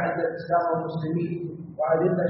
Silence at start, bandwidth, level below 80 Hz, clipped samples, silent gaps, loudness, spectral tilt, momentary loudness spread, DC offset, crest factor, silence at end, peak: 0 s; 5.6 kHz; -64 dBFS; under 0.1%; none; -26 LUFS; -7.5 dB/octave; 8 LU; under 0.1%; 16 dB; 0 s; -10 dBFS